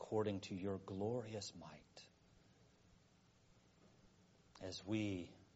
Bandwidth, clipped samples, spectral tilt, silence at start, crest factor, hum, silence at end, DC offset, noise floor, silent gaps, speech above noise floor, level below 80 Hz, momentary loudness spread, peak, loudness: 7.6 kHz; under 0.1%; -5.5 dB/octave; 0 s; 20 dB; none; 0.1 s; under 0.1%; -72 dBFS; none; 28 dB; -76 dBFS; 18 LU; -28 dBFS; -46 LUFS